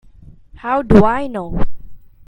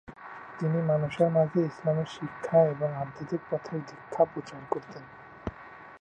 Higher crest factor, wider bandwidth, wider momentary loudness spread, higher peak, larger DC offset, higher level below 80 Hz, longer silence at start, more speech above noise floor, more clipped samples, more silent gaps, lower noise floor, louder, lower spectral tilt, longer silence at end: about the same, 16 dB vs 18 dB; about the same, 8.2 kHz vs 8.8 kHz; second, 17 LU vs 20 LU; first, 0 dBFS vs -10 dBFS; neither; first, -28 dBFS vs -60 dBFS; first, 0.65 s vs 0.1 s; first, 29 dB vs 20 dB; first, 0.3% vs under 0.1%; neither; second, -41 dBFS vs -48 dBFS; first, -16 LUFS vs -29 LUFS; about the same, -9 dB/octave vs -8.5 dB/octave; first, 0.3 s vs 0.05 s